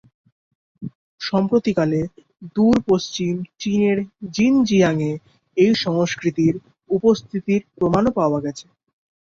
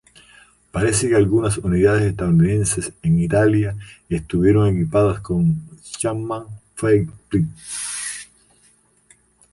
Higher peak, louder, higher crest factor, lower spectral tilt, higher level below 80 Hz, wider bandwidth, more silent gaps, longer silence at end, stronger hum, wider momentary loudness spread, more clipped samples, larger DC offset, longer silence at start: about the same, -4 dBFS vs -4 dBFS; about the same, -20 LUFS vs -19 LUFS; about the same, 16 dB vs 16 dB; about the same, -6.5 dB/octave vs -6 dB/octave; second, -52 dBFS vs -40 dBFS; second, 7.8 kHz vs 11.5 kHz; first, 0.95-1.18 s vs none; second, 0.8 s vs 1.3 s; neither; about the same, 14 LU vs 12 LU; neither; neither; about the same, 0.8 s vs 0.75 s